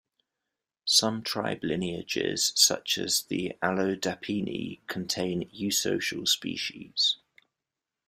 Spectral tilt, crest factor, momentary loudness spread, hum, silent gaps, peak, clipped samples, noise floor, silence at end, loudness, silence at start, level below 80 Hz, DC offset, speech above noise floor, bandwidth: -2.5 dB/octave; 24 dB; 11 LU; none; none; -6 dBFS; under 0.1%; -88 dBFS; 0.95 s; -27 LUFS; 0.85 s; -66 dBFS; under 0.1%; 59 dB; 16 kHz